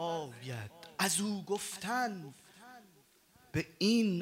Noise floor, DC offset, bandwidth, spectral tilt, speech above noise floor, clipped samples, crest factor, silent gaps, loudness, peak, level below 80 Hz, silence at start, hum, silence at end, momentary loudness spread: -66 dBFS; under 0.1%; 16 kHz; -4 dB/octave; 32 dB; under 0.1%; 18 dB; none; -35 LUFS; -18 dBFS; -70 dBFS; 0 s; none; 0 s; 24 LU